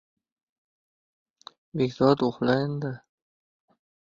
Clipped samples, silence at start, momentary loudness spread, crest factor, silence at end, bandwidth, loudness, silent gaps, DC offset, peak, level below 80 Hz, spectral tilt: under 0.1%; 1.75 s; 14 LU; 22 dB; 1.15 s; 7.4 kHz; -25 LUFS; none; under 0.1%; -6 dBFS; -64 dBFS; -8 dB/octave